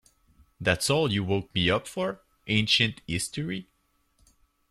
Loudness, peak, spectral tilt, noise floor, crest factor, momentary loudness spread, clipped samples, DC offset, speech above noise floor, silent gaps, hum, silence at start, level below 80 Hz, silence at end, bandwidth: -26 LUFS; -8 dBFS; -4 dB/octave; -69 dBFS; 22 dB; 11 LU; under 0.1%; under 0.1%; 42 dB; none; none; 0.6 s; -56 dBFS; 1.1 s; 14 kHz